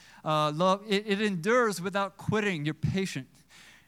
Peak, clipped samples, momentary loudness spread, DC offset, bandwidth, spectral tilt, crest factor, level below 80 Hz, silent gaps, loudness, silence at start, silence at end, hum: -12 dBFS; under 0.1%; 6 LU; under 0.1%; 15.5 kHz; -5.5 dB/octave; 16 dB; -60 dBFS; none; -28 LUFS; 0.25 s; 0.65 s; none